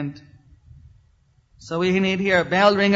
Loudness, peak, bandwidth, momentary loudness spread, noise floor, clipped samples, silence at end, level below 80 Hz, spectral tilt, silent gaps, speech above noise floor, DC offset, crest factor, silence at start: -19 LUFS; -2 dBFS; 7.8 kHz; 13 LU; -59 dBFS; under 0.1%; 0 s; -54 dBFS; -6 dB/octave; none; 40 dB; under 0.1%; 20 dB; 0 s